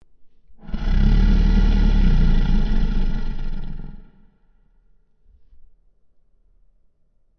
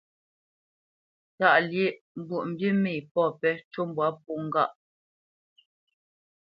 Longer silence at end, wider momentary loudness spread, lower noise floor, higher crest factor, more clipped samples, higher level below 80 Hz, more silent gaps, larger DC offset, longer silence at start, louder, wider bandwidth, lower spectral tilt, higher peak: first, 3.35 s vs 1.75 s; first, 16 LU vs 11 LU; second, -59 dBFS vs under -90 dBFS; second, 14 dB vs 22 dB; neither; first, -20 dBFS vs -78 dBFS; second, none vs 2.01-2.15 s, 3.11-3.15 s, 3.65-3.71 s; neither; second, 0.2 s vs 1.4 s; first, -22 LUFS vs -27 LUFS; about the same, 5.8 kHz vs 5.6 kHz; about the same, -8 dB/octave vs -9 dB/octave; about the same, -6 dBFS vs -6 dBFS